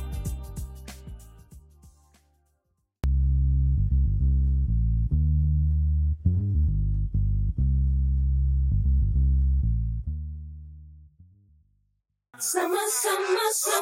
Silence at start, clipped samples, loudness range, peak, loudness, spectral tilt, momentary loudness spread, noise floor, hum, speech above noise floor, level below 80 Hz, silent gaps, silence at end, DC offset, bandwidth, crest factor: 0 s; under 0.1%; 7 LU; -10 dBFS; -25 LUFS; -5 dB/octave; 15 LU; -74 dBFS; none; 49 dB; -26 dBFS; none; 0 s; under 0.1%; 16.5 kHz; 14 dB